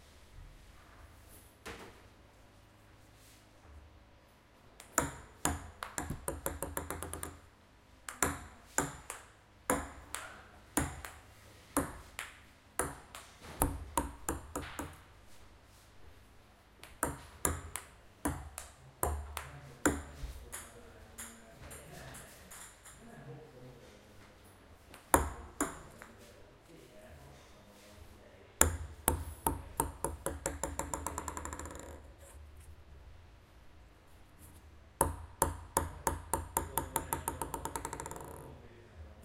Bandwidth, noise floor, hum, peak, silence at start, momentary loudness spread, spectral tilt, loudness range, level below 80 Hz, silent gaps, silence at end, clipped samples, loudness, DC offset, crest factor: 16 kHz; -62 dBFS; none; -4 dBFS; 0 s; 23 LU; -3.5 dB/octave; 14 LU; -50 dBFS; none; 0 s; under 0.1%; -38 LUFS; under 0.1%; 38 dB